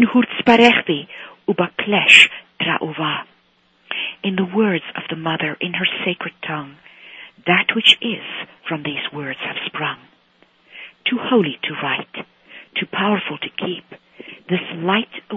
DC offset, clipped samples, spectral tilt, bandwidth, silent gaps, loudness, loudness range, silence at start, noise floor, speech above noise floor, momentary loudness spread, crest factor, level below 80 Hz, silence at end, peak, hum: under 0.1%; under 0.1%; -4.5 dB/octave; 10.5 kHz; none; -17 LUFS; 9 LU; 0 s; -59 dBFS; 40 dB; 17 LU; 20 dB; -64 dBFS; 0 s; 0 dBFS; none